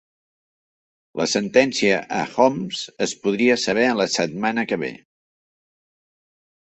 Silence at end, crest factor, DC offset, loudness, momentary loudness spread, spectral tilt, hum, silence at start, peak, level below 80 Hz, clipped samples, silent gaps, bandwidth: 1.7 s; 22 dB; under 0.1%; -20 LUFS; 9 LU; -3.5 dB/octave; none; 1.15 s; -2 dBFS; -62 dBFS; under 0.1%; none; 8.4 kHz